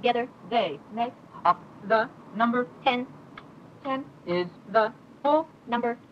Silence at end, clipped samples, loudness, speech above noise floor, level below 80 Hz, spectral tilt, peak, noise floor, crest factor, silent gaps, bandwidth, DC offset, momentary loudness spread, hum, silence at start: 0.15 s; under 0.1%; -28 LUFS; 20 dB; -72 dBFS; -6.5 dB/octave; -8 dBFS; -47 dBFS; 20 dB; none; 7.4 kHz; under 0.1%; 8 LU; none; 0 s